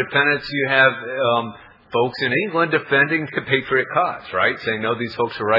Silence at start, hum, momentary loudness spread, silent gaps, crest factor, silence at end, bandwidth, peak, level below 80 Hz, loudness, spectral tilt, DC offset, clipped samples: 0 s; none; 7 LU; none; 18 dB; 0 s; 5.8 kHz; -2 dBFS; -60 dBFS; -19 LUFS; -7.5 dB/octave; under 0.1%; under 0.1%